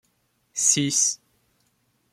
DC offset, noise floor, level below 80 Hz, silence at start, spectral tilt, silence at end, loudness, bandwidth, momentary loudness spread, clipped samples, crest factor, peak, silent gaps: under 0.1%; -69 dBFS; -70 dBFS; 0.55 s; -1.5 dB/octave; 1 s; -20 LUFS; 16 kHz; 16 LU; under 0.1%; 22 dB; -6 dBFS; none